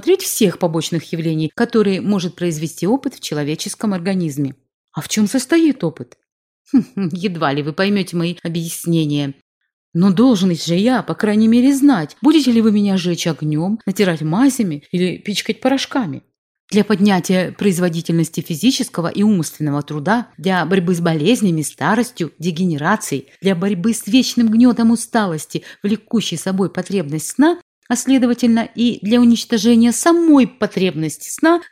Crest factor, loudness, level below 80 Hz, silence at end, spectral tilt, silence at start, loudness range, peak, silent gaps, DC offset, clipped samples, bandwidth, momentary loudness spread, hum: 14 dB; -17 LUFS; -60 dBFS; 0.05 s; -5.5 dB/octave; 0 s; 5 LU; -2 dBFS; 4.74-4.88 s, 6.32-6.65 s, 9.42-9.61 s, 9.73-9.92 s, 16.38-16.68 s, 27.62-27.82 s; under 0.1%; under 0.1%; 16 kHz; 9 LU; none